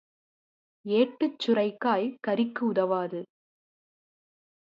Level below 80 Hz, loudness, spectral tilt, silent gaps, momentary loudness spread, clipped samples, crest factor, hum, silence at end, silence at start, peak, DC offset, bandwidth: -80 dBFS; -27 LUFS; -7 dB/octave; none; 7 LU; under 0.1%; 18 dB; none; 1.45 s; 0.85 s; -10 dBFS; under 0.1%; 7.4 kHz